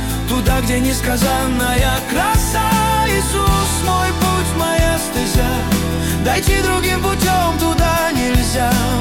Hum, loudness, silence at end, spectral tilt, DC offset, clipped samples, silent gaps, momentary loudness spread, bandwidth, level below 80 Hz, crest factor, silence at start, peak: none; -16 LUFS; 0 s; -4.5 dB/octave; under 0.1%; under 0.1%; none; 2 LU; 18 kHz; -22 dBFS; 12 dB; 0 s; -4 dBFS